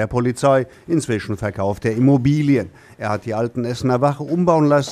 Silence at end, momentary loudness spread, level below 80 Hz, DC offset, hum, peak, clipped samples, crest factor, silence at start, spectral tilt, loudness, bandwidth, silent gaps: 0 s; 9 LU; -48 dBFS; under 0.1%; none; -2 dBFS; under 0.1%; 16 dB; 0 s; -7 dB/octave; -19 LUFS; 13 kHz; none